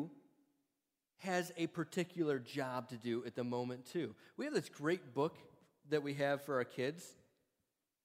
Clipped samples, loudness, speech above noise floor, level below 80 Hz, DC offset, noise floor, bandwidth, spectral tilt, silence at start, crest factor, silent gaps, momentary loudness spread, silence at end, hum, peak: under 0.1%; -41 LUFS; 49 dB; -86 dBFS; under 0.1%; -89 dBFS; 16 kHz; -5.5 dB/octave; 0 s; 20 dB; none; 6 LU; 0.9 s; none; -22 dBFS